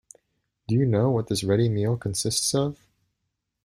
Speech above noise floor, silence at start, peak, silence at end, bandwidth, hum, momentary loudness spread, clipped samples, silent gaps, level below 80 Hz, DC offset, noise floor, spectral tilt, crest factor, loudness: 57 dB; 0.7 s; -8 dBFS; 0.9 s; 14 kHz; none; 5 LU; under 0.1%; none; -56 dBFS; under 0.1%; -80 dBFS; -5.5 dB/octave; 16 dB; -24 LUFS